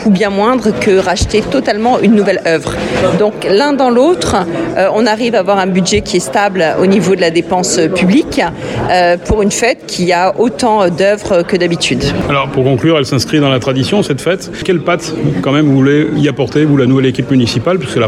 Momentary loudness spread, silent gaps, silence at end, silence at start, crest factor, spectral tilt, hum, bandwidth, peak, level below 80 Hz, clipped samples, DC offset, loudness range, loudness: 5 LU; none; 0 s; 0 s; 10 dB; -5 dB/octave; none; 14 kHz; 0 dBFS; -34 dBFS; under 0.1%; under 0.1%; 1 LU; -11 LUFS